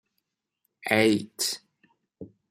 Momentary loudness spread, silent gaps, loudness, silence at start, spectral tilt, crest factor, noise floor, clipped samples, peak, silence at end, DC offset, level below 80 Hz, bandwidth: 16 LU; none; -25 LUFS; 0.85 s; -3.5 dB/octave; 24 dB; -81 dBFS; under 0.1%; -6 dBFS; 0.25 s; under 0.1%; -70 dBFS; 16 kHz